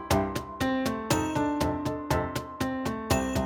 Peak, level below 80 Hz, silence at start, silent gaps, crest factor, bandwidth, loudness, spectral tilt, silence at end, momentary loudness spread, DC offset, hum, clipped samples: -10 dBFS; -42 dBFS; 0 s; none; 18 dB; over 20 kHz; -29 LUFS; -5 dB/octave; 0 s; 5 LU; under 0.1%; none; under 0.1%